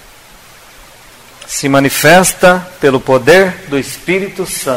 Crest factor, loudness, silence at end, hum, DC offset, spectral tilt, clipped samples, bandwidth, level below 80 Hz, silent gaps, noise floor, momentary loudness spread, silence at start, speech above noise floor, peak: 12 dB; -10 LUFS; 0 s; none; under 0.1%; -4 dB/octave; 0.5%; 16.5 kHz; -42 dBFS; none; -39 dBFS; 11 LU; 1.4 s; 28 dB; 0 dBFS